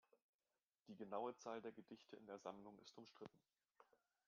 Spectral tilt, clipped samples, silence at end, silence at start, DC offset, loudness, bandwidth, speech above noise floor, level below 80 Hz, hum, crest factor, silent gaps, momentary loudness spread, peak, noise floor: -4 dB/octave; under 0.1%; 0.45 s; 0.15 s; under 0.1%; -56 LUFS; 7 kHz; over 35 dB; under -90 dBFS; none; 22 dB; 0.22-0.39 s, 0.63-0.67 s; 13 LU; -34 dBFS; under -90 dBFS